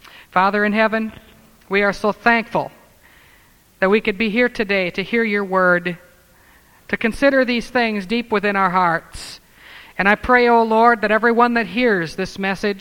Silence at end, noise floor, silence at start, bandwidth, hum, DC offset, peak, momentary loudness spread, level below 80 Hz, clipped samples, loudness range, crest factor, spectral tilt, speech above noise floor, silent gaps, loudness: 0 s; -52 dBFS; 0.35 s; 17 kHz; none; under 0.1%; 0 dBFS; 10 LU; -46 dBFS; under 0.1%; 4 LU; 18 dB; -5.5 dB/octave; 34 dB; none; -17 LUFS